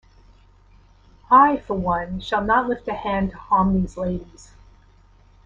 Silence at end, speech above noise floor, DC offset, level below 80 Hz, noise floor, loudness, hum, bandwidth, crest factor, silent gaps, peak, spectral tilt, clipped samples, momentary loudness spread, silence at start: 1.2 s; 32 dB; under 0.1%; -42 dBFS; -52 dBFS; -21 LUFS; none; 7.6 kHz; 20 dB; none; -2 dBFS; -7.5 dB/octave; under 0.1%; 12 LU; 1.3 s